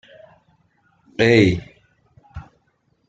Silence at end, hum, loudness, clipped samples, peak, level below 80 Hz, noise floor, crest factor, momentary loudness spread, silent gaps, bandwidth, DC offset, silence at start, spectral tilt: 0.7 s; none; -17 LUFS; under 0.1%; -2 dBFS; -48 dBFS; -65 dBFS; 22 dB; 27 LU; none; 9 kHz; under 0.1%; 1.2 s; -6.5 dB/octave